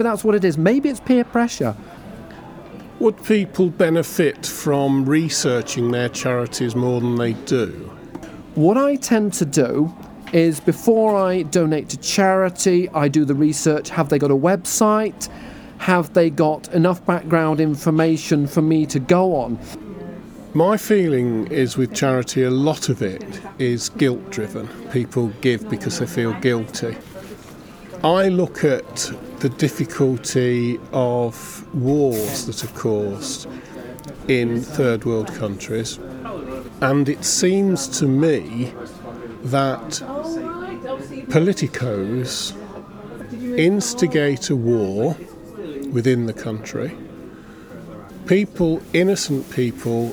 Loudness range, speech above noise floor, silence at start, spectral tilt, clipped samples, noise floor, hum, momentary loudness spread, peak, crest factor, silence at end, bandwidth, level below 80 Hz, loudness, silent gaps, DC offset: 5 LU; 21 dB; 0 s; -5.5 dB/octave; under 0.1%; -39 dBFS; none; 18 LU; -2 dBFS; 18 dB; 0 s; over 20 kHz; -50 dBFS; -19 LUFS; none; under 0.1%